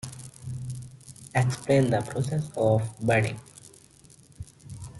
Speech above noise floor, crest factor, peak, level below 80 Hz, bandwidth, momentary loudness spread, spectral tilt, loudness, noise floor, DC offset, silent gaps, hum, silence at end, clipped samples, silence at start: 30 dB; 18 dB; -10 dBFS; -56 dBFS; 12 kHz; 22 LU; -6.5 dB/octave; -26 LUFS; -54 dBFS; under 0.1%; none; none; 0 s; under 0.1%; 0.05 s